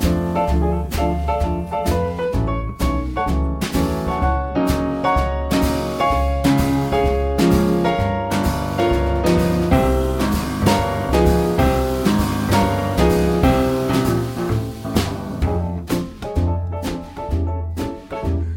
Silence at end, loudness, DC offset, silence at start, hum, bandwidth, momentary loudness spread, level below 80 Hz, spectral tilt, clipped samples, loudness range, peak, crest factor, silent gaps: 0 s; -19 LUFS; under 0.1%; 0 s; none; 17 kHz; 7 LU; -26 dBFS; -6.5 dB/octave; under 0.1%; 5 LU; 0 dBFS; 18 dB; none